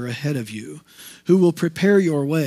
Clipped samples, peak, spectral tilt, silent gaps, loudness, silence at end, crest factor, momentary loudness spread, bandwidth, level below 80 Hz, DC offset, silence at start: under 0.1%; -4 dBFS; -7 dB/octave; none; -19 LUFS; 0 s; 16 dB; 18 LU; 15.5 kHz; -68 dBFS; under 0.1%; 0 s